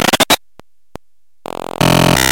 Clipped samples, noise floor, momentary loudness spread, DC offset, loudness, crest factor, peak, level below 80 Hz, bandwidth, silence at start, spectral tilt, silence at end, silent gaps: under 0.1%; -48 dBFS; 18 LU; 0.9%; -12 LUFS; 14 dB; 0 dBFS; -34 dBFS; 17.5 kHz; 0 s; -3.5 dB/octave; 0 s; none